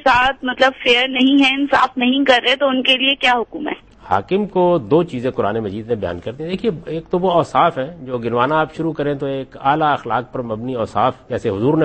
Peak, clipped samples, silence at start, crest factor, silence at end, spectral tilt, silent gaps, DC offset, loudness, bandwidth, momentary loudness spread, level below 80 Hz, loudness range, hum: 0 dBFS; under 0.1%; 0 s; 16 dB; 0 s; -5.5 dB/octave; none; under 0.1%; -17 LUFS; 8.8 kHz; 11 LU; -48 dBFS; 6 LU; none